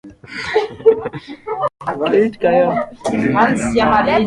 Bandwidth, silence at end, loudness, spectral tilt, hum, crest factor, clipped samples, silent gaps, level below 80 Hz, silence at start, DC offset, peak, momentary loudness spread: 11.5 kHz; 0 s; -16 LUFS; -5.5 dB/octave; none; 16 dB; under 0.1%; none; -44 dBFS; 0.05 s; under 0.1%; 0 dBFS; 13 LU